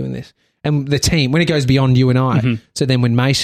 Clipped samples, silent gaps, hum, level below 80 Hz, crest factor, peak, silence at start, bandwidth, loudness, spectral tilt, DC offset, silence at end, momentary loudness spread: under 0.1%; none; none; -40 dBFS; 12 dB; -2 dBFS; 0 s; 14 kHz; -15 LUFS; -5.5 dB/octave; under 0.1%; 0 s; 7 LU